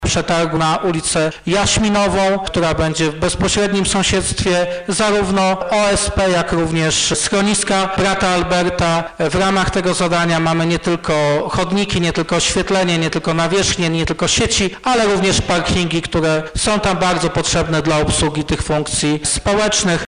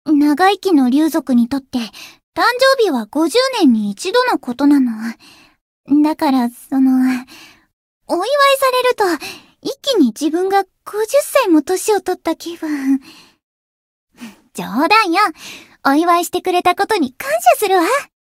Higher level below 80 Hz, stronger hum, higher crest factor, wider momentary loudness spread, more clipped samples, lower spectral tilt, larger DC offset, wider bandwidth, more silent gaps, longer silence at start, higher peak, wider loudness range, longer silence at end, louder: first, -32 dBFS vs -60 dBFS; neither; second, 10 dB vs 16 dB; second, 3 LU vs 12 LU; neither; about the same, -4 dB/octave vs -3.5 dB/octave; neither; second, 10.5 kHz vs 16.5 kHz; second, none vs 2.23-2.33 s, 5.61-5.84 s, 7.73-8.01 s, 13.43-14.08 s; about the same, 0 s vs 0.05 s; second, -6 dBFS vs 0 dBFS; about the same, 1 LU vs 3 LU; second, 0 s vs 0.2 s; about the same, -16 LUFS vs -15 LUFS